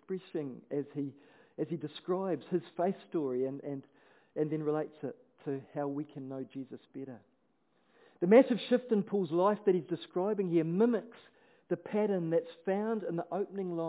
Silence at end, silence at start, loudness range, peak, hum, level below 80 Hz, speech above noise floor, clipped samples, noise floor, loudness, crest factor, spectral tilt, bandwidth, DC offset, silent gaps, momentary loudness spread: 0 s; 0.1 s; 9 LU; -10 dBFS; none; under -90 dBFS; 42 dB; under 0.1%; -74 dBFS; -33 LUFS; 24 dB; -7 dB/octave; 4 kHz; under 0.1%; none; 15 LU